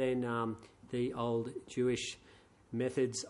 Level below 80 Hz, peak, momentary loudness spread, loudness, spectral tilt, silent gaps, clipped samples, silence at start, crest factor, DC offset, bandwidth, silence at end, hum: -66 dBFS; -22 dBFS; 9 LU; -37 LUFS; -5 dB/octave; none; under 0.1%; 0 s; 16 dB; under 0.1%; 11.5 kHz; 0 s; none